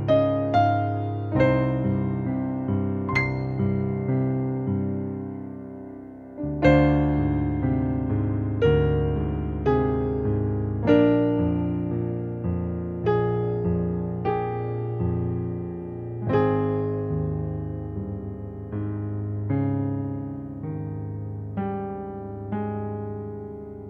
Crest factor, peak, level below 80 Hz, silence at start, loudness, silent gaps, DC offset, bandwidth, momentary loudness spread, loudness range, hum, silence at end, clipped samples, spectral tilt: 18 dB; -6 dBFS; -40 dBFS; 0 s; -25 LUFS; none; under 0.1%; 6.8 kHz; 13 LU; 7 LU; none; 0 s; under 0.1%; -10 dB/octave